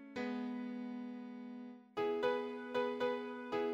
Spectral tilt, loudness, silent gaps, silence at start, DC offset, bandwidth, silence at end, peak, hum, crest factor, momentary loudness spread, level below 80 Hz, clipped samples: -6 dB/octave; -41 LUFS; none; 0 s; under 0.1%; 8.2 kHz; 0 s; -22 dBFS; none; 18 dB; 12 LU; -82 dBFS; under 0.1%